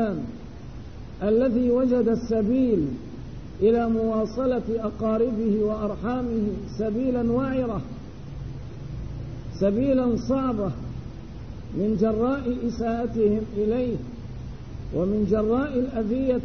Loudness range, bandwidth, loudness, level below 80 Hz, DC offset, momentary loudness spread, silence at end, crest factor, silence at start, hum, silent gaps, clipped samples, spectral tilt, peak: 4 LU; 6.6 kHz; -25 LUFS; -42 dBFS; 0.6%; 16 LU; 0 s; 16 dB; 0 s; none; none; under 0.1%; -9 dB/octave; -10 dBFS